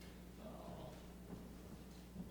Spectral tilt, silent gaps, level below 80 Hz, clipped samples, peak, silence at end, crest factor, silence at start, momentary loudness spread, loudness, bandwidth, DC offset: -6 dB/octave; none; -60 dBFS; under 0.1%; -40 dBFS; 0 s; 14 dB; 0 s; 3 LU; -55 LUFS; over 20 kHz; under 0.1%